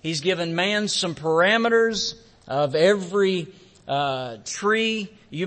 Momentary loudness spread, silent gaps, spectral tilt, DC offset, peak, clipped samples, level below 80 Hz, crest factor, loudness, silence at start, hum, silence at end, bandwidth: 11 LU; none; -4 dB/octave; under 0.1%; -6 dBFS; under 0.1%; -62 dBFS; 16 dB; -22 LUFS; 0.05 s; none; 0 s; 8.8 kHz